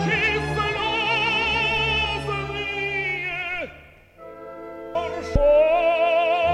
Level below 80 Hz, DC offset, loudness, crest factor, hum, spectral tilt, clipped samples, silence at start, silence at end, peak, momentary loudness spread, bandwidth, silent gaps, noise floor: -38 dBFS; under 0.1%; -21 LUFS; 18 dB; none; -5 dB/octave; under 0.1%; 0 s; 0 s; -4 dBFS; 14 LU; 11.5 kHz; none; -47 dBFS